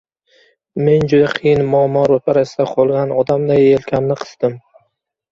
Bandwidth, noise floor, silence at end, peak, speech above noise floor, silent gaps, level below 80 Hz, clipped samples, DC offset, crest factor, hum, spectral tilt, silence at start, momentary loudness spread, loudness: 7.4 kHz; -66 dBFS; 0.75 s; -2 dBFS; 52 dB; none; -48 dBFS; under 0.1%; under 0.1%; 14 dB; none; -7.5 dB/octave; 0.75 s; 8 LU; -15 LUFS